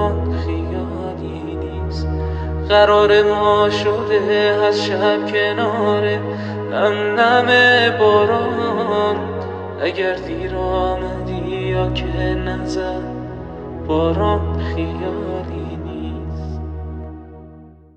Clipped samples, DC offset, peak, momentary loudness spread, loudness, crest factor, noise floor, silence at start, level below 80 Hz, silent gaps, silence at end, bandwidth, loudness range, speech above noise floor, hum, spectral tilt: under 0.1%; under 0.1%; -2 dBFS; 15 LU; -18 LUFS; 16 dB; -41 dBFS; 0 s; -32 dBFS; none; 0.25 s; 8.6 kHz; 7 LU; 25 dB; none; -6.5 dB/octave